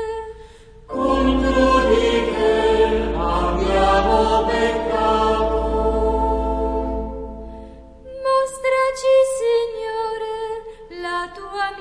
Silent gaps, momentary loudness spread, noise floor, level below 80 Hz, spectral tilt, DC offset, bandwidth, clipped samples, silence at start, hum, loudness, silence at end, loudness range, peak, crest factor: none; 15 LU; -42 dBFS; -30 dBFS; -5.5 dB/octave; under 0.1%; 11 kHz; under 0.1%; 0 s; none; -19 LUFS; 0 s; 5 LU; -4 dBFS; 16 dB